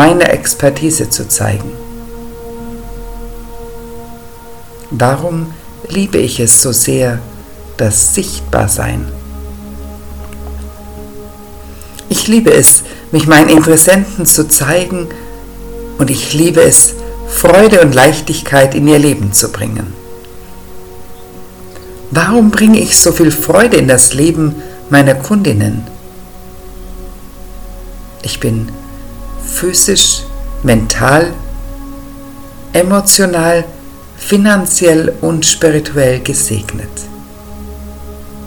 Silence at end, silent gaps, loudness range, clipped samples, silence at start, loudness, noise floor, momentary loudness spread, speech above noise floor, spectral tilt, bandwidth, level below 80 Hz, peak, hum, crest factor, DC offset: 0 s; none; 13 LU; 2%; 0 s; -9 LUFS; -31 dBFS; 24 LU; 22 dB; -3.5 dB/octave; over 20 kHz; -30 dBFS; 0 dBFS; none; 12 dB; under 0.1%